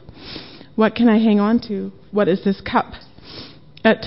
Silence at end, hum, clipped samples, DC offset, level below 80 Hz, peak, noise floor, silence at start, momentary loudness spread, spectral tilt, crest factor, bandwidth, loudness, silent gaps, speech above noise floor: 0 s; none; under 0.1%; 0.5%; -50 dBFS; -2 dBFS; -40 dBFS; 0.2 s; 22 LU; -10.5 dB/octave; 16 dB; 5.8 kHz; -18 LUFS; none; 22 dB